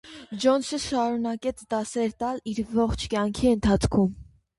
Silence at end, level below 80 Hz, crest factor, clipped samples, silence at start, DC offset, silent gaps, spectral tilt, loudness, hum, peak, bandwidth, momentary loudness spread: 0.35 s; -42 dBFS; 16 dB; under 0.1%; 0.05 s; under 0.1%; none; -5.5 dB/octave; -26 LUFS; none; -10 dBFS; 11.5 kHz; 8 LU